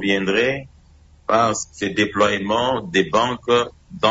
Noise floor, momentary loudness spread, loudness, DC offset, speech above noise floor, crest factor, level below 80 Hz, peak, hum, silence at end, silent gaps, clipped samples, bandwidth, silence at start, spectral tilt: -50 dBFS; 6 LU; -20 LUFS; under 0.1%; 31 dB; 16 dB; -50 dBFS; -4 dBFS; none; 0 s; none; under 0.1%; 8 kHz; 0 s; -4 dB/octave